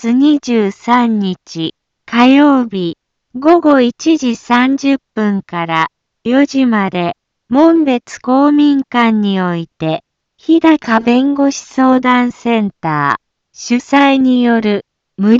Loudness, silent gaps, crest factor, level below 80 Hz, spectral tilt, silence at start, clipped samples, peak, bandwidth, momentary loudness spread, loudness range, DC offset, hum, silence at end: -12 LUFS; none; 12 dB; -56 dBFS; -5.5 dB/octave; 0 s; under 0.1%; 0 dBFS; 7.6 kHz; 11 LU; 2 LU; under 0.1%; none; 0 s